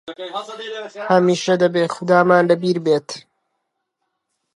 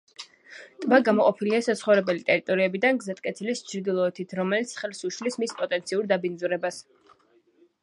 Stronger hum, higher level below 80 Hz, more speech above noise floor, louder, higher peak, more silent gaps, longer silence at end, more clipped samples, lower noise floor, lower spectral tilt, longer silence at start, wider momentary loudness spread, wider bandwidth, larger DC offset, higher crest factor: neither; first, -70 dBFS vs -78 dBFS; first, 58 dB vs 37 dB; first, -17 LUFS vs -25 LUFS; first, 0 dBFS vs -4 dBFS; neither; first, 1.35 s vs 1 s; neither; first, -75 dBFS vs -62 dBFS; about the same, -5.5 dB/octave vs -5 dB/octave; second, 0.05 s vs 0.2 s; first, 16 LU vs 11 LU; about the same, 11.5 kHz vs 11.5 kHz; neither; about the same, 18 dB vs 22 dB